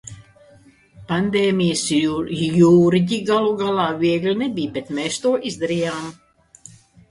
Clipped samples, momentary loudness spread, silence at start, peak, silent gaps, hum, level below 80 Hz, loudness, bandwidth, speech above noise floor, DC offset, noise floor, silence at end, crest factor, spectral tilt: under 0.1%; 11 LU; 0.05 s; -4 dBFS; none; none; -54 dBFS; -19 LUFS; 11.5 kHz; 32 dB; under 0.1%; -51 dBFS; 0.95 s; 16 dB; -5.5 dB/octave